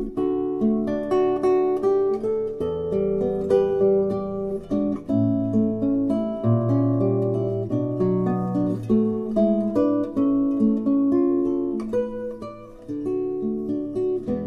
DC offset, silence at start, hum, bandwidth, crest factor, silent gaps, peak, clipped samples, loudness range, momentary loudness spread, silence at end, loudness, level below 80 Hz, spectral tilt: under 0.1%; 0 s; none; 6.4 kHz; 14 dB; none; -8 dBFS; under 0.1%; 2 LU; 7 LU; 0 s; -23 LUFS; -50 dBFS; -10.5 dB/octave